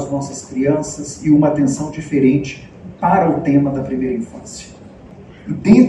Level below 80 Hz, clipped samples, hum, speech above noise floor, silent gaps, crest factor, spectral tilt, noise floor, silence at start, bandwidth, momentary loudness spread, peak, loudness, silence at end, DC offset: -46 dBFS; under 0.1%; none; 23 dB; none; 16 dB; -7 dB/octave; -38 dBFS; 0 s; 11.5 kHz; 19 LU; 0 dBFS; -17 LUFS; 0 s; under 0.1%